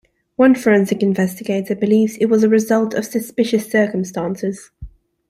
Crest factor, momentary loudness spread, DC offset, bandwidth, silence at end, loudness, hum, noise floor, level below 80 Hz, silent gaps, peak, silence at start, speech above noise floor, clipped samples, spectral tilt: 16 dB; 9 LU; under 0.1%; 15.5 kHz; 0.4 s; -17 LUFS; none; -38 dBFS; -50 dBFS; none; -2 dBFS; 0.4 s; 22 dB; under 0.1%; -6 dB/octave